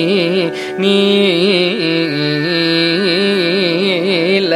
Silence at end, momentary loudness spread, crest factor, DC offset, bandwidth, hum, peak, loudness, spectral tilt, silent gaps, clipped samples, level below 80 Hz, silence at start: 0 s; 4 LU; 12 dB; under 0.1%; 13.5 kHz; none; 0 dBFS; -13 LUFS; -5.5 dB/octave; none; under 0.1%; -62 dBFS; 0 s